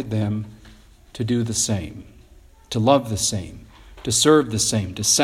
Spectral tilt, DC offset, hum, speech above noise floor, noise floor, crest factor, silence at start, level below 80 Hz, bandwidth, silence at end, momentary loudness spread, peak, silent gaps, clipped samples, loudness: -4 dB/octave; under 0.1%; none; 28 dB; -49 dBFS; 20 dB; 0 s; -48 dBFS; 15.5 kHz; 0 s; 15 LU; -2 dBFS; none; under 0.1%; -20 LUFS